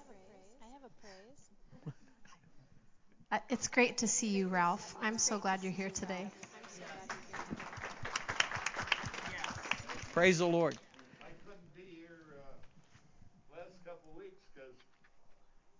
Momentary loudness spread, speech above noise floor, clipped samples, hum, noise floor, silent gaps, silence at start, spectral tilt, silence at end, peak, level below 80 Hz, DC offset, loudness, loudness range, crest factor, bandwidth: 26 LU; 27 dB; under 0.1%; none; -62 dBFS; none; 0 s; -3 dB/octave; 0.1 s; -10 dBFS; -66 dBFS; under 0.1%; -35 LUFS; 22 LU; 28 dB; 7.8 kHz